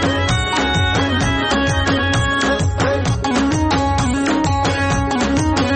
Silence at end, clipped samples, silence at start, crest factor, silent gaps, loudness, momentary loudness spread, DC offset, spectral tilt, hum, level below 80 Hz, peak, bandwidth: 0 s; under 0.1%; 0 s; 10 dB; none; -17 LUFS; 1 LU; under 0.1%; -5 dB/octave; none; -28 dBFS; -6 dBFS; 8.8 kHz